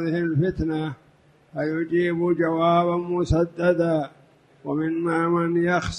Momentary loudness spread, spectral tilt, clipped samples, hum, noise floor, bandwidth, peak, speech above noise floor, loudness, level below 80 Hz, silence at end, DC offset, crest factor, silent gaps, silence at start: 10 LU; -7.5 dB/octave; under 0.1%; none; -57 dBFS; 9.8 kHz; -8 dBFS; 34 dB; -23 LUFS; -44 dBFS; 0 s; under 0.1%; 16 dB; none; 0 s